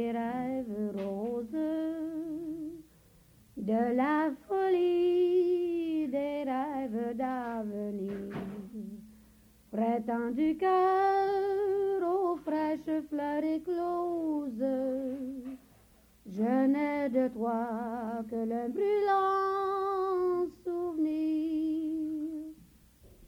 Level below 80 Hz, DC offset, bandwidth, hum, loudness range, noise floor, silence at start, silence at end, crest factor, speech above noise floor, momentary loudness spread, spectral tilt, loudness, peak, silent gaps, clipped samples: -66 dBFS; under 0.1%; 16 kHz; none; 6 LU; -61 dBFS; 0 s; 0 s; 14 dB; 32 dB; 12 LU; -7.5 dB/octave; -31 LUFS; -16 dBFS; none; under 0.1%